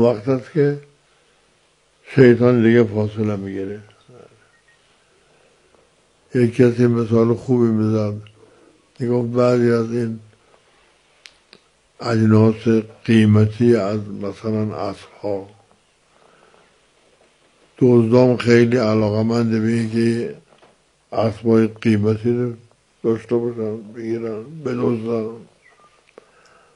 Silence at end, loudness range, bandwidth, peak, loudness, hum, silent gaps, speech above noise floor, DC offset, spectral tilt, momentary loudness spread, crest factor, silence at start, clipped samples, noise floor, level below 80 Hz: 1.35 s; 9 LU; 11 kHz; 0 dBFS; -18 LUFS; none; none; 42 dB; under 0.1%; -8 dB/octave; 14 LU; 18 dB; 0 s; under 0.1%; -59 dBFS; -58 dBFS